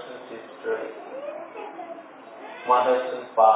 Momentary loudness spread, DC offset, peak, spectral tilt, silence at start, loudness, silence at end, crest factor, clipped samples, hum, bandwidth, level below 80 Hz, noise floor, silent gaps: 20 LU; under 0.1%; -4 dBFS; -7 dB/octave; 0 s; -26 LUFS; 0 s; 20 dB; under 0.1%; none; 4 kHz; under -90 dBFS; -43 dBFS; none